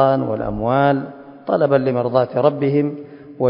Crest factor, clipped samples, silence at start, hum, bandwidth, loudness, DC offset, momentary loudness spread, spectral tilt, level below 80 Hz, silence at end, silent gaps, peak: 18 dB; under 0.1%; 0 s; none; 5.4 kHz; -18 LUFS; under 0.1%; 17 LU; -12.5 dB/octave; -46 dBFS; 0 s; none; 0 dBFS